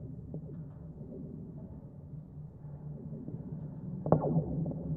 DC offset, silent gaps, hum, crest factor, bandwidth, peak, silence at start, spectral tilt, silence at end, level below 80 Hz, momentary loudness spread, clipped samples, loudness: under 0.1%; none; none; 28 dB; 1.9 kHz; -10 dBFS; 0 s; -14 dB/octave; 0 s; -56 dBFS; 17 LU; under 0.1%; -38 LUFS